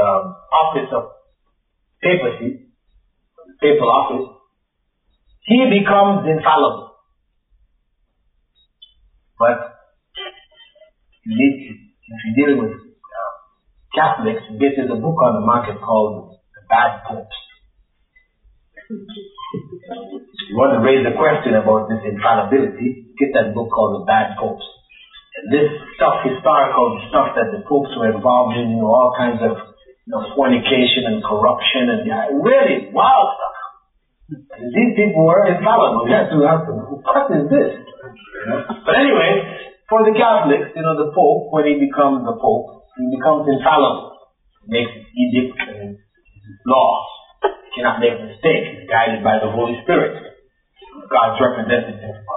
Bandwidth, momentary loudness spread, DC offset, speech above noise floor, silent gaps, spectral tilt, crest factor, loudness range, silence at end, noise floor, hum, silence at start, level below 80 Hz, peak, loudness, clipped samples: 4.1 kHz; 19 LU; under 0.1%; 54 dB; none; -3.5 dB/octave; 14 dB; 7 LU; 0 s; -69 dBFS; none; 0 s; -54 dBFS; -2 dBFS; -16 LUFS; under 0.1%